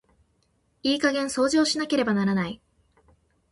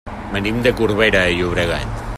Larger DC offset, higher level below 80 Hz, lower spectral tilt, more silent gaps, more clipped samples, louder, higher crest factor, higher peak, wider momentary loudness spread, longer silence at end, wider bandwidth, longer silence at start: neither; second, -60 dBFS vs -32 dBFS; about the same, -4.5 dB/octave vs -5.5 dB/octave; neither; neither; second, -24 LUFS vs -17 LUFS; about the same, 18 dB vs 16 dB; second, -10 dBFS vs -2 dBFS; about the same, 8 LU vs 9 LU; first, 0.95 s vs 0 s; second, 11.5 kHz vs 15.5 kHz; first, 0.85 s vs 0.05 s